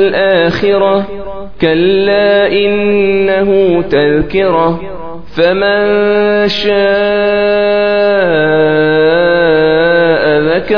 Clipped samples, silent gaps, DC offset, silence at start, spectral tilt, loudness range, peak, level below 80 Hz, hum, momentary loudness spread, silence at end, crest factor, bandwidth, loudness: under 0.1%; none; 3%; 0 s; -7 dB/octave; 2 LU; 0 dBFS; -36 dBFS; none; 4 LU; 0 s; 10 dB; 5.4 kHz; -10 LUFS